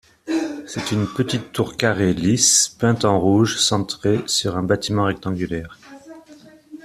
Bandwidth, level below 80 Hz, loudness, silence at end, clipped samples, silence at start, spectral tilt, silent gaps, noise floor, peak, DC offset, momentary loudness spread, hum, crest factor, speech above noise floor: 15 kHz; -50 dBFS; -19 LUFS; 0.1 s; under 0.1%; 0.25 s; -4 dB/octave; none; -46 dBFS; -2 dBFS; under 0.1%; 11 LU; none; 18 dB; 27 dB